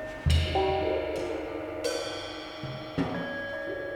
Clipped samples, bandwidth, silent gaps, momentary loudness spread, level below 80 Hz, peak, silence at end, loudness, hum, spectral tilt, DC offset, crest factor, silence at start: under 0.1%; 14.5 kHz; none; 10 LU; -42 dBFS; -12 dBFS; 0 s; -31 LUFS; none; -5.5 dB/octave; under 0.1%; 18 dB; 0 s